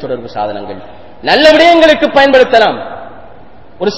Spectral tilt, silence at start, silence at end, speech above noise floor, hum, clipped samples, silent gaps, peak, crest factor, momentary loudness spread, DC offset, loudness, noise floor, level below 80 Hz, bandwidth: -4 dB/octave; 0 s; 0 s; 29 dB; none; 3%; none; 0 dBFS; 10 dB; 21 LU; 2%; -8 LUFS; -38 dBFS; -42 dBFS; 8 kHz